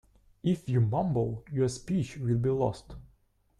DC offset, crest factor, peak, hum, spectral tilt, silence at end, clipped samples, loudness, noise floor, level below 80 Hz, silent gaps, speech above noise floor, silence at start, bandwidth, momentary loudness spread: under 0.1%; 16 dB; -16 dBFS; none; -8 dB/octave; 0.55 s; under 0.1%; -30 LUFS; -67 dBFS; -54 dBFS; none; 38 dB; 0.45 s; 11.5 kHz; 6 LU